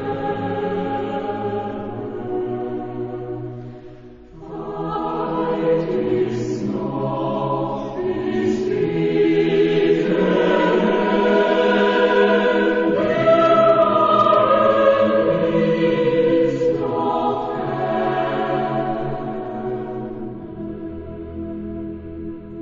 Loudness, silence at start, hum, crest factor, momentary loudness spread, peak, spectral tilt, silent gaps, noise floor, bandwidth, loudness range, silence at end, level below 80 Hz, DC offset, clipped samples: -19 LUFS; 0 s; none; 18 dB; 16 LU; -2 dBFS; -7.5 dB/octave; none; -40 dBFS; 7.6 kHz; 12 LU; 0 s; -48 dBFS; under 0.1%; under 0.1%